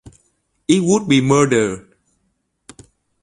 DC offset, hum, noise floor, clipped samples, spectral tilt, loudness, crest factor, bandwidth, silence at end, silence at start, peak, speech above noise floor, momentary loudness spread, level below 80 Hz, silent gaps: under 0.1%; none; -68 dBFS; under 0.1%; -5 dB/octave; -15 LUFS; 18 dB; 11 kHz; 1.45 s; 0.05 s; -2 dBFS; 54 dB; 14 LU; -52 dBFS; none